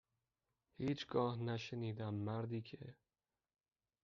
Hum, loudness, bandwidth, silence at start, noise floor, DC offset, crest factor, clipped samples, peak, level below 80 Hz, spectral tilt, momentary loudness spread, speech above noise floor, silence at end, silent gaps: none; -43 LUFS; 7 kHz; 0.8 s; under -90 dBFS; under 0.1%; 20 dB; under 0.1%; -24 dBFS; -78 dBFS; -6 dB/octave; 13 LU; over 48 dB; 1.1 s; none